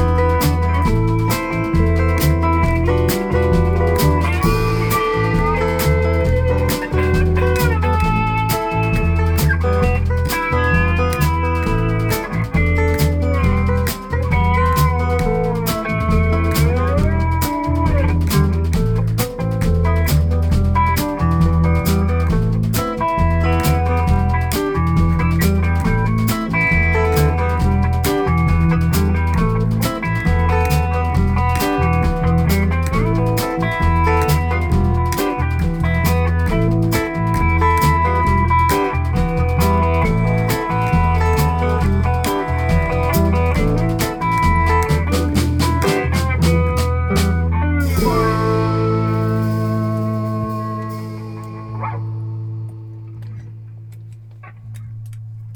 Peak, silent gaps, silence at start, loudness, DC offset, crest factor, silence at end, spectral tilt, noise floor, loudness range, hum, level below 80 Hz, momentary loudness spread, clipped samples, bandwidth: -2 dBFS; none; 0 s; -17 LUFS; 0.1%; 12 dB; 0 s; -6.5 dB/octave; -37 dBFS; 2 LU; none; -22 dBFS; 5 LU; under 0.1%; over 20 kHz